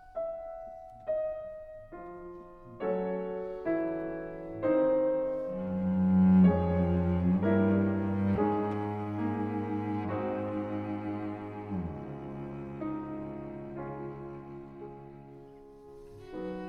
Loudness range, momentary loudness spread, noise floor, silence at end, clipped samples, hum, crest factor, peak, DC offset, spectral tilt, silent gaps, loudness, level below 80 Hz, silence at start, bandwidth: 14 LU; 20 LU; -51 dBFS; 0 s; under 0.1%; none; 18 dB; -14 dBFS; under 0.1%; -11 dB/octave; none; -31 LUFS; -54 dBFS; 0 s; 4.1 kHz